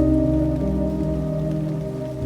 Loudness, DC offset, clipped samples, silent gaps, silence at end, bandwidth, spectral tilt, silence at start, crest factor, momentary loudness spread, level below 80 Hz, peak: -23 LUFS; under 0.1%; under 0.1%; none; 0 s; 11.5 kHz; -10 dB/octave; 0 s; 14 dB; 7 LU; -30 dBFS; -6 dBFS